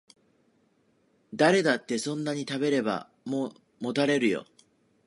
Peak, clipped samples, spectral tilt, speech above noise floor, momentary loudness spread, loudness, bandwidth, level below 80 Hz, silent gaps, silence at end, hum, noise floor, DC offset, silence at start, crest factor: -8 dBFS; under 0.1%; -5 dB/octave; 41 dB; 12 LU; -27 LUFS; 11.5 kHz; -76 dBFS; none; 0.65 s; none; -68 dBFS; under 0.1%; 1.3 s; 22 dB